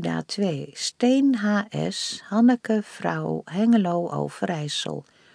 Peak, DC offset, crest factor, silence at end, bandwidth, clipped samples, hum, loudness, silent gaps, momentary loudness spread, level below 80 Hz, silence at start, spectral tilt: -8 dBFS; under 0.1%; 16 dB; 0.35 s; 10.5 kHz; under 0.1%; none; -24 LUFS; none; 9 LU; -68 dBFS; 0 s; -5 dB/octave